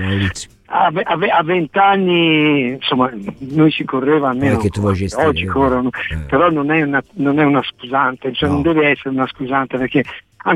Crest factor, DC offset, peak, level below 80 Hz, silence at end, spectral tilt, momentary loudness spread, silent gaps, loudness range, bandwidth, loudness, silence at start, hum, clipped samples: 14 dB; under 0.1%; -2 dBFS; -40 dBFS; 0 s; -6.5 dB/octave; 7 LU; none; 2 LU; 11 kHz; -16 LUFS; 0 s; none; under 0.1%